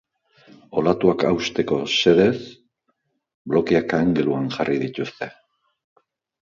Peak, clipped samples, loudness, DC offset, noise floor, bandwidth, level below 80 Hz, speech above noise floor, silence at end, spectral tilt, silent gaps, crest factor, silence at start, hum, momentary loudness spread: -2 dBFS; under 0.1%; -20 LUFS; under 0.1%; -72 dBFS; 7.4 kHz; -54 dBFS; 52 dB; 1.2 s; -5.5 dB/octave; 3.34-3.45 s; 20 dB; 0.7 s; none; 14 LU